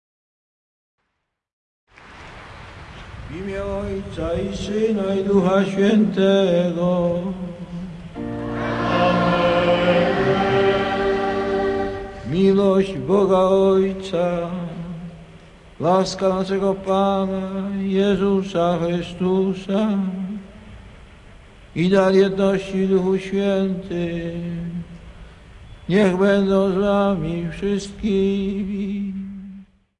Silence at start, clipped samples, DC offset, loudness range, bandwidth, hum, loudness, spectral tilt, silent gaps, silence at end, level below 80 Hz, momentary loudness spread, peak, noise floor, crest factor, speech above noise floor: 2.05 s; under 0.1%; under 0.1%; 5 LU; 10.5 kHz; none; -20 LUFS; -7 dB/octave; none; 0.35 s; -44 dBFS; 15 LU; -4 dBFS; -76 dBFS; 18 dB; 57 dB